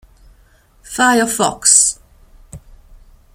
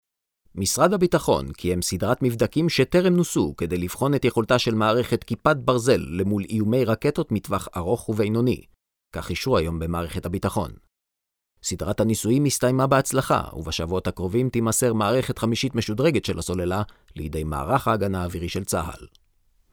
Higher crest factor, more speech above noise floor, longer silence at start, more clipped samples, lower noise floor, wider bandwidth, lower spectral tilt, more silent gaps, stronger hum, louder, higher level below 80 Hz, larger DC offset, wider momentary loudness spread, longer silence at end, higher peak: about the same, 18 dB vs 20 dB; second, 37 dB vs 61 dB; first, 0.9 s vs 0.55 s; neither; second, -51 dBFS vs -84 dBFS; about the same, over 20 kHz vs over 20 kHz; second, -1 dB/octave vs -5.5 dB/octave; neither; neither; first, -12 LUFS vs -23 LUFS; about the same, -46 dBFS vs -44 dBFS; neither; first, 15 LU vs 9 LU; about the same, 0.75 s vs 0.65 s; first, 0 dBFS vs -4 dBFS